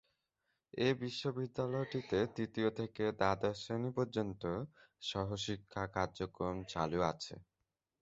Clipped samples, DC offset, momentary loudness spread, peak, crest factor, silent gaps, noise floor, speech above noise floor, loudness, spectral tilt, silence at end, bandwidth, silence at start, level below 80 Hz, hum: under 0.1%; under 0.1%; 7 LU; -16 dBFS; 22 dB; none; -88 dBFS; 50 dB; -38 LUFS; -5 dB/octave; 0.6 s; 8 kHz; 0.75 s; -62 dBFS; none